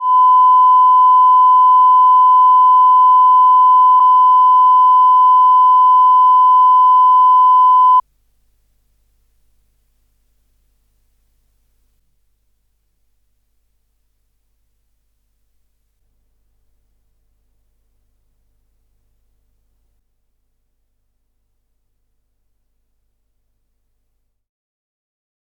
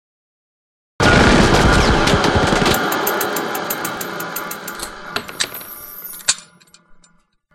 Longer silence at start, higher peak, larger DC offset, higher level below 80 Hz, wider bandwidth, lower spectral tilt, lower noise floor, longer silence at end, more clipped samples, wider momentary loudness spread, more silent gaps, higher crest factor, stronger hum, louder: second, 0 s vs 1 s; second, -6 dBFS vs 0 dBFS; neither; second, -62 dBFS vs -28 dBFS; second, 3.2 kHz vs 17 kHz; second, -2 dB/octave vs -4 dB/octave; first, -67 dBFS vs -56 dBFS; first, 17.5 s vs 1.15 s; neither; second, 0 LU vs 15 LU; neither; second, 8 dB vs 18 dB; neither; first, -9 LUFS vs -16 LUFS